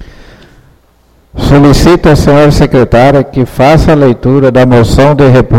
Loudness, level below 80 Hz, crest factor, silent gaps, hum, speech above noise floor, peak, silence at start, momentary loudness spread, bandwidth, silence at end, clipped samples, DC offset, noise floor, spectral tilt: -5 LUFS; -18 dBFS; 6 dB; none; none; 41 dB; 0 dBFS; 0 s; 4 LU; 15.5 kHz; 0 s; 6%; 2%; -45 dBFS; -7 dB/octave